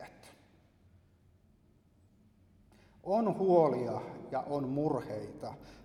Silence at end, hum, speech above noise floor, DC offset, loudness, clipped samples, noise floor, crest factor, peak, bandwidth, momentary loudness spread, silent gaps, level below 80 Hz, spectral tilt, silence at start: 0 s; none; 34 dB; under 0.1%; -33 LUFS; under 0.1%; -66 dBFS; 22 dB; -14 dBFS; 12.5 kHz; 19 LU; none; -68 dBFS; -8.5 dB/octave; 0 s